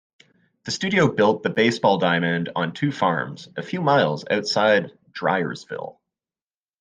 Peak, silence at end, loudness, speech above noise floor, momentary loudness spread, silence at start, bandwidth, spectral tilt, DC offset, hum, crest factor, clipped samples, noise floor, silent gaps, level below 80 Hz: -4 dBFS; 0.9 s; -21 LUFS; over 69 dB; 14 LU; 0.65 s; 9.6 kHz; -5.5 dB/octave; under 0.1%; none; 18 dB; under 0.1%; under -90 dBFS; none; -64 dBFS